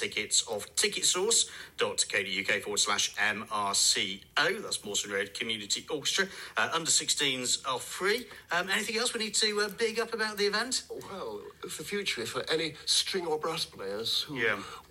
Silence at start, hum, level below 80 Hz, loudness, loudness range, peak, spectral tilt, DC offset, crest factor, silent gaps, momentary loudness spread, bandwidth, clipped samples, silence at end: 0 s; none; -68 dBFS; -29 LUFS; 4 LU; -12 dBFS; -0.5 dB/octave; under 0.1%; 20 dB; none; 8 LU; 16 kHz; under 0.1%; 0.05 s